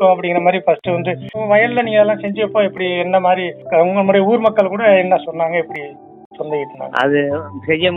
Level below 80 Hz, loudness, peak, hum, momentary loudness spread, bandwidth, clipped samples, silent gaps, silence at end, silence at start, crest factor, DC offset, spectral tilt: -62 dBFS; -15 LUFS; 0 dBFS; none; 10 LU; 4.9 kHz; under 0.1%; 6.26-6.31 s; 0 s; 0 s; 16 dB; under 0.1%; -8 dB/octave